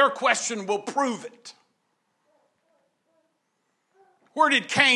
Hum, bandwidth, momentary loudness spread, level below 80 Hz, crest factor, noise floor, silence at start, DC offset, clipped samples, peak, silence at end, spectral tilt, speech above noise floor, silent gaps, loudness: none; 12 kHz; 22 LU; -74 dBFS; 24 dB; -74 dBFS; 0 s; under 0.1%; under 0.1%; -2 dBFS; 0 s; -2 dB/octave; 50 dB; none; -23 LUFS